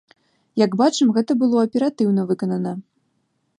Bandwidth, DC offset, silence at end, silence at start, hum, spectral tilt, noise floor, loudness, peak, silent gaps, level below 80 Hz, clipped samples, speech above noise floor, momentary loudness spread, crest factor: 10.5 kHz; under 0.1%; 0.8 s; 0.55 s; none; -6 dB/octave; -69 dBFS; -20 LUFS; -4 dBFS; none; -70 dBFS; under 0.1%; 51 dB; 10 LU; 16 dB